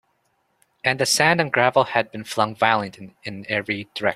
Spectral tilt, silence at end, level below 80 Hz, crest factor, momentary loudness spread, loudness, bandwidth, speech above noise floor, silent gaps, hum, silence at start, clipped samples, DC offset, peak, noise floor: -3 dB/octave; 0 s; -62 dBFS; 22 dB; 16 LU; -20 LUFS; 16 kHz; 47 dB; none; none; 0.85 s; under 0.1%; under 0.1%; 0 dBFS; -68 dBFS